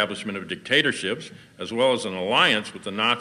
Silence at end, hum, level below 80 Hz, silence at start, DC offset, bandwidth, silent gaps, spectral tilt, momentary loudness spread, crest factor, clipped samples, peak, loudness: 0 s; none; -68 dBFS; 0 s; under 0.1%; 14.5 kHz; none; -3.5 dB/octave; 14 LU; 20 dB; under 0.1%; -4 dBFS; -23 LUFS